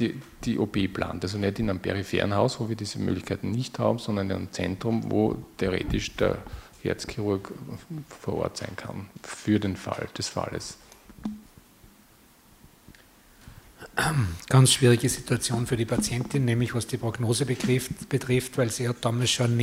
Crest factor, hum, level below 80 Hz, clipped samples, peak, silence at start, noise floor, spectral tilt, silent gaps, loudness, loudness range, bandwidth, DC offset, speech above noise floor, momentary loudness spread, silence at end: 22 dB; none; -48 dBFS; under 0.1%; -6 dBFS; 0 s; -56 dBFS; -5 dB/octave; none; -27 LUFS; 10 LU; 16 kHz; under 0.1%; 30 dB; 14 LU; 0 s